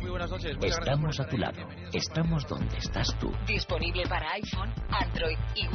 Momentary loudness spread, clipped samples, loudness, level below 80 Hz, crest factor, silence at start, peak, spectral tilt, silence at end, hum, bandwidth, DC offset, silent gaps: 5 LU; under 0.1%; -31 LUFS; -36 dBFS; 14 dB; 0 s; -16 dBFS; -4 dB/octave; 0 s; none; 6.6 kHz; under 0.1%; none